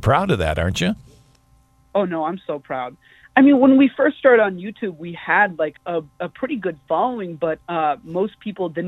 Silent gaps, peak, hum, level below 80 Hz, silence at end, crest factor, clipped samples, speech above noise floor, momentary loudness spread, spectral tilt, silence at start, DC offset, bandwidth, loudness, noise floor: none; -2 dBFS; none; -44 dBFS; 0 s; 18 dB; under 0.1%; 37 dB; 15 LU; -6.5 dB/octave; 0 s; under 0.1%; 12 kHz; -19 LUFS; -56 dBFS